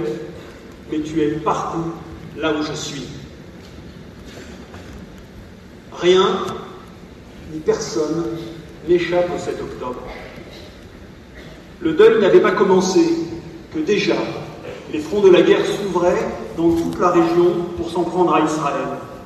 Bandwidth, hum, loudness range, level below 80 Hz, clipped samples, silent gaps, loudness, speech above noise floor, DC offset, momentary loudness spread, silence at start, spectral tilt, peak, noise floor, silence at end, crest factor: 12.5 kHz; none; 10 LU; -46 dBFS; under 0.1%; none; -18 LUFS; 23 dB; under 0.1%; 25 LU; 0 s; -5.5 dB/octave; -2 dBFS; -39 dBFS; 0 s; 18 dB